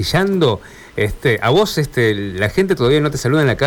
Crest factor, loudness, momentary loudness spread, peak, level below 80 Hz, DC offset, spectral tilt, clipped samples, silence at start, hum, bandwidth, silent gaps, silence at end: 10 dB; -16 LUFS; 7 LU; -6 dBFS; -36 dBFS; under 0.1%; -5.5 dB/octave; under 0.1%; 0 s; none; 19.5 kHz; none; 0 s